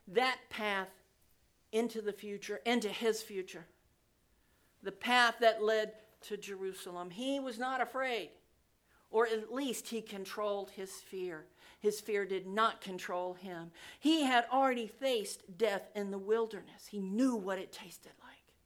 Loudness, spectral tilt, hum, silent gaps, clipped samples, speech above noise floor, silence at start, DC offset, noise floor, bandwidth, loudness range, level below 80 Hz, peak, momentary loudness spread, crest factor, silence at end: -35 LUFS; -3.5 dB/octave; none; none; under 0.1%; 37 dB; 0.05 s; under 0.1%; -72 dBFS; 19 kHz; 5 LU; -78 dBFS; -12 dBFS; 17 LU; 24 dB; 0.3 s